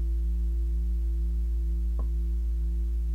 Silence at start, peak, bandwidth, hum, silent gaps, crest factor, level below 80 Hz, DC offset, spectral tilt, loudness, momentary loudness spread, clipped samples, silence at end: 0 s; -22 dBFS; 1.2 kHz; none; none; 6 dB; -26 dBFS; under 0.1%; -9 dB/octave; -31 LUFS; 1 LU; under 0.1%; 0 s